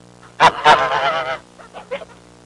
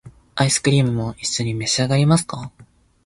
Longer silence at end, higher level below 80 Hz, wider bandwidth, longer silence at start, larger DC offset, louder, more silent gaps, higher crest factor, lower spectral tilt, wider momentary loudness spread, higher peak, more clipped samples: about the same, 0.4 s vs 0.4 s; about the same, -52 dBFS vs -48 dBFS; about the same, 11.5 kHz vs 11.5 kHz; first, 0.4 s vs 0.05 s; neither; first, -15 LUFS vs -19 LUFS; neither; about the same, 16 dB vs 16 dB; second, -2.5 dB/octave vs -4.5 dB/octave; first, 19 LU vs 15 LU; about the same, -2 dBFS vs -4 dBFS; neither